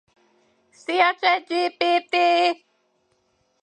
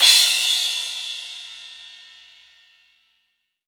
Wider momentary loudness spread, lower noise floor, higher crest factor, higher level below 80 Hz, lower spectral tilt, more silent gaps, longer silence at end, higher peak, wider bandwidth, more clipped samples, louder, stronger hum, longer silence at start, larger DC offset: second, 8 LU vs 25 LU; second, -68 dBFS vs -72 dBFS; second, 18 dB vs 24 dB; about the same, -80 dBFS vs -78 dBFS; first, -1.5 dB/octave vs 5.5 dB/octave; neither; second, 1.1 s vs 1.75 s; second, -4 dBFS vs 0 dBFS; second, 9.4 kHz vs over 20 kHz; neither; second, -21 LUFS vs -18 LUFS; neither; first, 0.9 s vs 0 s; neither